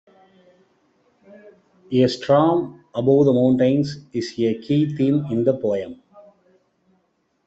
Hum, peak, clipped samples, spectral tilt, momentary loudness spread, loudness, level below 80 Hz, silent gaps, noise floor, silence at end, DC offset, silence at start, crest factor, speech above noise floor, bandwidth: none; -4 dBFS; under 0.1%; -8 dB/octave; 11 LU; -20 LUFS; -62 dBFS; none; -68 dBFS; 1.5 s; under 0.1%; 1.9 s; 18 dB; 49 dB; 8 kHz